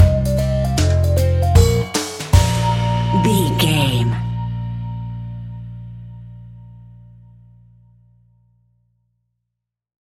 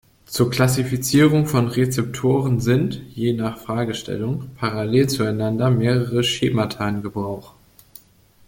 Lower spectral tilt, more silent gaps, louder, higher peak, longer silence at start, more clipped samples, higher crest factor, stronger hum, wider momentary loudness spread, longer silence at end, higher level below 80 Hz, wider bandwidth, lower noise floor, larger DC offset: about the same, -5.5 dB/octave vs -6 dB/octave; neither; first, -17 LUFS vs -20 LUFS; about the same, -2 dBFS vs -2 dBFS; second, 0 s vs 0.3 s; neither; about the same, 18 dB vs 20 dB; first, 60 Hz at -45 dBFS vs none; first, 20 LU vs 9 LU; first, 3.3 s vs 0.95 s; first, -28 dBFS vs -50 dBFS; about the same, 16.5 kHz vs 17 kHz; first, -80 dBFS vs -53 dBFS; neither